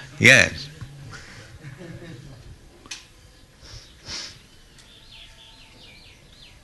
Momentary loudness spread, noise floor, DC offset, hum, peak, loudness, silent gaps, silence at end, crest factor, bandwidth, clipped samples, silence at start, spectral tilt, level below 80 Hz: 31 LU; -50 dBFS; under 0.1%; none; -2 dBFS; -17 LUFS; none; 2.35 s; 26 dB; 12 kHz; under 0.1%; 0 s; -3 dB/octave; -52 dBFS